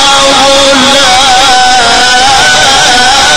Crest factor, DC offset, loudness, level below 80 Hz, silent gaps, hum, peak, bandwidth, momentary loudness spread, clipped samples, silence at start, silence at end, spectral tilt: 4 dB; 8%; -3 LUFS; -28 dBFS; none; none; 0 dBFS; over 20 kHz; 1 LU; 5%; 0 s; 0 s; -0.5 dB/octave